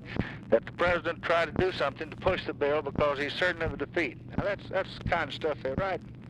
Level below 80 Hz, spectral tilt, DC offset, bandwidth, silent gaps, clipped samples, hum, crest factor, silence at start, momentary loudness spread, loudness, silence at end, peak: -48 dBFS; -6.5 dB/octave; under 0.1%; 11 kHz; none; under 0.1%; none; 20 dB; 0 s; 5 LU; -30 LUFS; 0 s; -12 dBFS